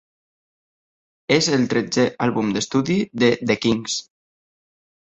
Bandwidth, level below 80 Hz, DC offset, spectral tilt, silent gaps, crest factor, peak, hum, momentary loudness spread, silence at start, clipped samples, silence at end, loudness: 8.2 kHz; -58 dBFS; under 0.1%; -4.5 dB/octave; none; 20 dB; -2 dBFS; none; 6 LU; 1.3 s; under 0.1%; 1 s; -20 LUFS